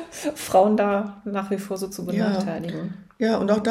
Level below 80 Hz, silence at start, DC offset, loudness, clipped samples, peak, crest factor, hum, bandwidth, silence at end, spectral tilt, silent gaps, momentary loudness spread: -60 dBFS; 0 s; under 0.1%; -24 LUFS; under 0.1%; -6 dBFS; 18 dB; none; 16 kHz; 0 s; -6 dB/octave; none; 11 LU